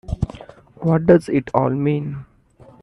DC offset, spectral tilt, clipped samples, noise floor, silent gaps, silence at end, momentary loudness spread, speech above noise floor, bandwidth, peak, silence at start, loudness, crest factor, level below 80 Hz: under 0.1%; -9 dB/octave; under 0.1%; -48 dBFS; none; 0.6 s; 14 LU; 31 dB; 11 kHz; 0 dBFS; 0.1 s; -19 LUFS; 20 dB; -40 dBFS